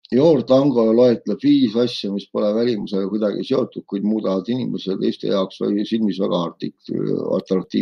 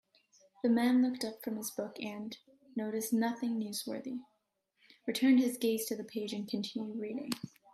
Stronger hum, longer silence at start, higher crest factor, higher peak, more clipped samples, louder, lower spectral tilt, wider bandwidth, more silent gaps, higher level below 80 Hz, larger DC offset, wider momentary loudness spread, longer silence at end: neither; second, 0.1 s vs 0.65 s; about the same, 16 dB vs 18 dB; first, -2 dBFS vs -18 dBFS; neither; first, -20 LUFS vs -34 LUFS; first, -8 dB/octave vs -4.5 dB/octave; second, 7 kHz vs 15 kHz; neither; first, -64 dBFS vs -82 dBFS; neither; second, 9 LU vs 15 LU; second, 0 s vs 0.25 s